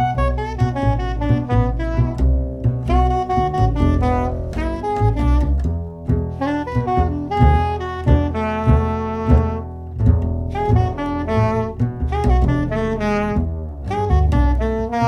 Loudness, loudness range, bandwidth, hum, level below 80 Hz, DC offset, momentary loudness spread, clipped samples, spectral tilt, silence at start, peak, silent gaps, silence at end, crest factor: -19 LUFS; 2 LU; 6.6 kHz; none; -22 dBFS; under 0.1%; 6 LU; under 0.1%; -8.5 dB/octave; 0 s; 0 dBFS; none; 0 s; 16 dB